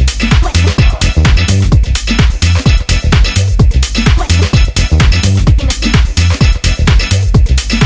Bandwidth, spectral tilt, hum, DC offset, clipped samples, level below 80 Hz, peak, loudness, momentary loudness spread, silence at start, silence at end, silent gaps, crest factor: 8 kHz; -5 dB/octave; none; 0.4%; under 0.1%; -10 dBFS; 0 dBFS; -10 LUFS; 2 LU; 0 s; 0 s; none; 8 dB